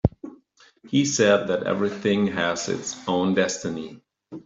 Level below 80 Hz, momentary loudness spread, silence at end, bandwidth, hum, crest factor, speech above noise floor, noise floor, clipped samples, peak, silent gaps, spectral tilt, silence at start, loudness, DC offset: -48 dBFS; 18 LU; 0.05 s; 8 kHz; none; 20 dB; 33 dB; -56 dBFS; under 0.1%; -4 dBFS; none; -4.5 dB/octave; 0.05 s; -23 LUFS; under 0.1%